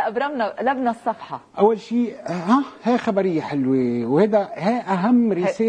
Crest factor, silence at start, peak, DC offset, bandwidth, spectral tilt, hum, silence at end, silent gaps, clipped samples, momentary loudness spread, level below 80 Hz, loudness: 18 dB; 0 s; -2 dBFS; under 0.1%; 9 kHz; -7.5 dB/octave; none; 0 s; none; under 0.1%; 7 LU; -64 dBFS; -21 LUFS